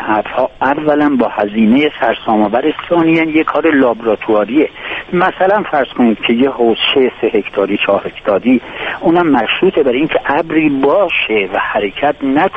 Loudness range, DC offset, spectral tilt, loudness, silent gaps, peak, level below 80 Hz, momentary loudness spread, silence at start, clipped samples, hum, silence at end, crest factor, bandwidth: 1 LU; under 0.1%; -7.5 dB/octave; -13 LUFS; none; 0 dBFS; -44 dBFS; 5 LU; 0 s; under 0.1%; none; 0 s; 12 dB; 5.2 kHz